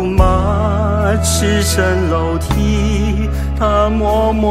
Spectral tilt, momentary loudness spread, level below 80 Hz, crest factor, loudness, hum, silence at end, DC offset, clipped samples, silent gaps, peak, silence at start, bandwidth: -5.5 dB/octave; 4 LU; -18 dBFS; 14 dB; -15 LUFS; none; 0 s; under 0.1%; under 0.1%; none; 0 dBFS; 0 s; 15.5 kHz